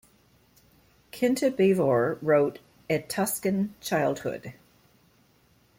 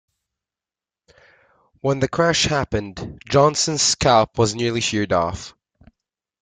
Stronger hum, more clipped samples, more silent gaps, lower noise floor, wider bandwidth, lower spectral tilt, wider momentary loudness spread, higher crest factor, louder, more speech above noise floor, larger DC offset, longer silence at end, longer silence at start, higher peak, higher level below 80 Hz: neither; neither; neither; second, -63 dBFS vs under -90 dBFS; first, 16.5 kHz vs 10 kHz; first, -5.5 dB/octave vs -3.5 dB/octave; first, 14 LU vs 11 LU; about the same, 18 dB vs 18 dB; second, -26 LUFS vs -19 LUFS; second, 38 dB vs over 71 dB; neither; first, 1.25 s vs 0.95 s; second, 1.15 s vs 1.85 s; second, -10 dBFS vs -4 dBFS; second, -64 dBFS vs -46 dBFS